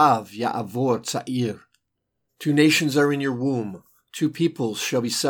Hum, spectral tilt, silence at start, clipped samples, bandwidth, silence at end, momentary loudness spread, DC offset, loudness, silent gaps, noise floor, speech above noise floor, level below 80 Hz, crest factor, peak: none; -4.5 dB/octave; 0 s; under 0.1%; 19 kHz; 0 s; 12 LU; under 0.1%; -23 LUFS; none; -77 dBFS; 55 dB; -72 dBFS; 18 dB; -4 dBFS